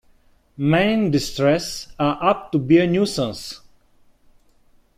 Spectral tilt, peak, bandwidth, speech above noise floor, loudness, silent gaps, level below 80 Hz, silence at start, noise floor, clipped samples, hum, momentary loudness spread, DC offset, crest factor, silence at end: -6 dB/octave; -4 dBFS; 15.5 kHz; 37 dB; -20 LUFS; none; -48 dBFS; 0.6 s; -56 dBFS; under 0.1%; none; 13 LU; under 0.1%; 18 dB; 1.4 s